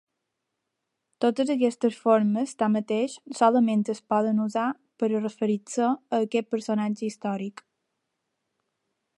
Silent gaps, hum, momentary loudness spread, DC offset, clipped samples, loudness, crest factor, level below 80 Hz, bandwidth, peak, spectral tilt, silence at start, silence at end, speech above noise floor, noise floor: none; none; 8 LU; under 0.1%; under 0.1%; -26 LUFS; 20 dB; -80 dBFS; 11.5 kHz; -8 dBFS; -6 dB/octave; 1.2 s; 1.65 s; 57 dB; -82 dBFS